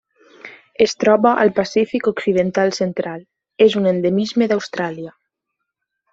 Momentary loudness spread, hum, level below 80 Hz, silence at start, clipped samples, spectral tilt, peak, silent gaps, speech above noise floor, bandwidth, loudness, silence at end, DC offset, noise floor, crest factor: 13 LU; none; -60 dBFS; 0.45 s; under 0.1%; -5.5 dB/octave; -2 dBFS; none; 61 dB; 7.8 kHz; -17 LUFS; 1.05 s; under 0.1%; -78 dBFS; 16 dB